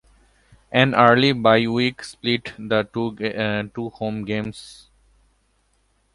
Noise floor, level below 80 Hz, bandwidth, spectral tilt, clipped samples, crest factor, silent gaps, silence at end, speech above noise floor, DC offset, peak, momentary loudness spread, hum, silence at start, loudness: -65 dBFS; -54 dBFS; 11.5 kHz; -6 dB/octave; under 0.1%; 22 dB; none; 1.4 s; 44 dB; under 0.1%; 0 dBFS; 13 LU; none; 0.7 s; -20 LUFS